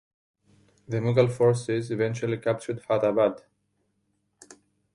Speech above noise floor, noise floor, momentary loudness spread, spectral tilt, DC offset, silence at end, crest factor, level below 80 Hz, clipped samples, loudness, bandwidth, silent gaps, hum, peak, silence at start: 49 dB; -74 dBFS; 8 LU; -7 dB/octave; under 0.1%; 0.4 s; 20 dB; -64 dBFS; under 0.1%; -25 LUFS; 11.5 kHz; none; none; -6 dBFS; 0.9 s